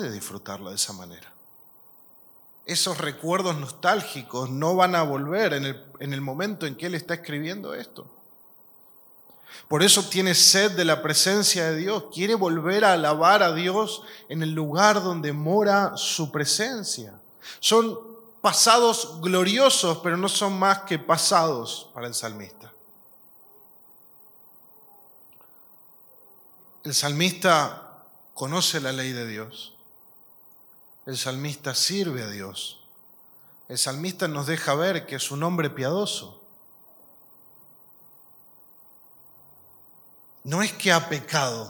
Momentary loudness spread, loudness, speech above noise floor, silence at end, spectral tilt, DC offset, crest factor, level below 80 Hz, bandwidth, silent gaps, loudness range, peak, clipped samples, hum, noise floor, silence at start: 17 LU; -23 LUFS; 29 dB; 0 s; -3 dB/octave; under 0.1%; 24 dB; -78 dBFS; 19 kHz; none; 12 LU; -2 dBFS; under 0.1%; none; -53 dBFS; 0 s